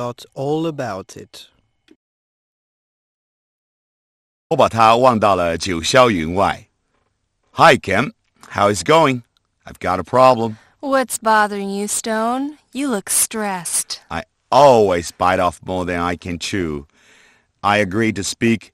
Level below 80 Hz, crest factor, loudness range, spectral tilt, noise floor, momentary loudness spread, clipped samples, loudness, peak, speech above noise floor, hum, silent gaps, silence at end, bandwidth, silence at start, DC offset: -48 dBFS; 18 dB; 5 LU; -4 dB/octave; -67 dBFS; 15 LU; under 0.1%; -17 LUFS; 0 dBFS; 50 dB; none; 1.96-4.50 s; 0.1 s; 15.5 kHz; 0 s; under 0.1%